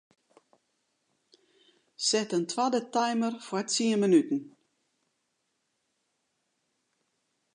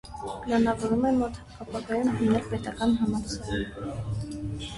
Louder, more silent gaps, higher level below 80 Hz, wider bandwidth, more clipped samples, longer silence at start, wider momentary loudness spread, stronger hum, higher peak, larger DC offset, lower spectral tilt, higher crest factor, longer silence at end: about the same, -28 LUFS vs -28 LUFS; neither; second, -86 dBFS vs -44 dBFS; about the same, 11 kHz vs 11.5 kHz; neither; first, 2 s vs 0.05 s; second, 8 LU vs 11 LU; neither; about the same, -12 dBFS vs -12 dBFS; neither; second, -3.5 dB/octave vs -6.5 dB/octave; about the same, 20 dB vs 16 dB; first, 3.05 s vs 0 s